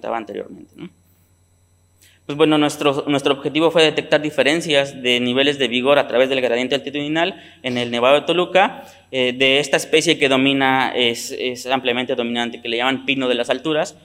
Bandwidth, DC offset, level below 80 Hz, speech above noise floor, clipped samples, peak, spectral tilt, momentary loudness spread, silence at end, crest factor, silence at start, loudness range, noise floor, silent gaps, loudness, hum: 16 kHz; under 0.1%; -68 dBFS; 39 dB; under 0.1%; -2 dBFS; -4 dB/octave; 9 LU; 0.15 s; 18 dB; 0.05 s; 3 LU; -57 dBFS; none; -18 LUFS; none